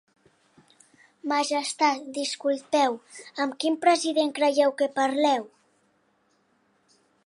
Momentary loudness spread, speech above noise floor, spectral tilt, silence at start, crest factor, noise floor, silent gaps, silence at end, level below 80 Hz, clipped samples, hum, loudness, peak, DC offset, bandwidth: 8 LU; 43 dB; -1.5 dB/octave; 1.25 s; 20 dB; -68 dBFS; none; 1.8 s; -84 dBFS; under 0.1%; none; -25 LUFS; -8 dBFS; under 0.1%; 11.5 kHz